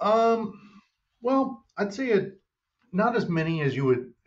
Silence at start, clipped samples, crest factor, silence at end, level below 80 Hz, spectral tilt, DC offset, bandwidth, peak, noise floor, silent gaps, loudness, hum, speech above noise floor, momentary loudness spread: 0 s; under 0.1%; 16 dB; 0.2 s; -66 dBFS; -7.5 dB/octave; under 0.1%; 7.8 kHz; -12 dBFS; -72 dBFS; none; -26 LUFS; none; 47 dB; 9 LU